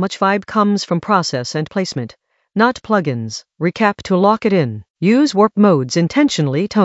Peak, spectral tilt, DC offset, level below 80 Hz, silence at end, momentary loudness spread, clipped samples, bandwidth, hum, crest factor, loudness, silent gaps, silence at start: 0 dBFS; -6 dB/octave; under 0.1%; -56 dBFS; 0 s; 10 LU; under 0.1%; 8 kHz; none; 16 dB; -16 LUFS; 4.90-4.94 s; 0 s